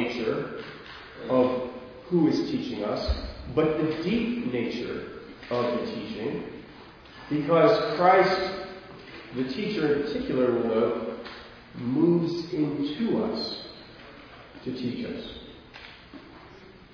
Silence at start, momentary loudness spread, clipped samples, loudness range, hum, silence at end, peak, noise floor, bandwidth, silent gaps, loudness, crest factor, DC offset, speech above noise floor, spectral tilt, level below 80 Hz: 0 s; 22 LU; under 0.1%; 7 LU; none; 0.15 s; -6 dBFS; -49 dBFS; 5.4 kHz; none; -27 LUFS; 20 dB; under 0.1%; 23 dB; -7 dB/octave; -46 dBFS